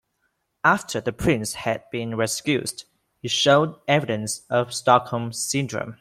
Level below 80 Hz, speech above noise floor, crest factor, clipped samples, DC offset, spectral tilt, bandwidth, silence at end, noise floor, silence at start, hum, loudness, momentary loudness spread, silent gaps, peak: -52 dBFS; 50 dB; 20 dB; under 0.1%; under 0.1%; -4 dB/octave; 16 kHz; 0.05 s; -73 dBFS; 0.65 s; none; -23 LUFS; 10 LU; none; -2 dBFS